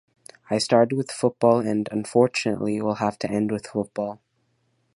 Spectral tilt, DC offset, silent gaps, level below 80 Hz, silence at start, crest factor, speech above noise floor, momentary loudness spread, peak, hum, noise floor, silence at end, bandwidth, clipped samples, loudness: -5.5 dB/octave; under 0.1%; none; -62 dBFS; 0.5 s; 20 dB; 47 dB; 9 LU; -4 dBFS; none; -69 dBFS; 0.8 s; 11.5 kHz; under 0.1%; -23 LUFS